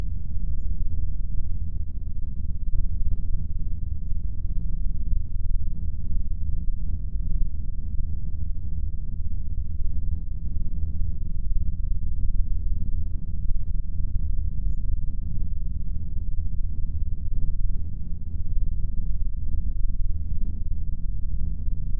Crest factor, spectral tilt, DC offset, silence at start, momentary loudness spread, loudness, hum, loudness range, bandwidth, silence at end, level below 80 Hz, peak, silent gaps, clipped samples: 14 dB; -13.5 dB/octave; 7%; 0 s; 3 LU; -33 LUFS; none; 1 LU; 0.6 kHz; 0 s; -26 dBFS; -8 dBFS; none; under 0.1%